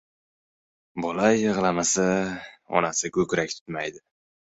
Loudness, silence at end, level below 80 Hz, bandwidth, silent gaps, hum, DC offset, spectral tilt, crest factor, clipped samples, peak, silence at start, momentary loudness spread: -25 LUFS; 0.6 s; -60 dBFS; 8.4 kHz; 3.61-3.66 s; none; under 0.1%; -4 dB/octave; 22 dB; under 0.1%; -4 dBFS; 0.95 s; 11 LU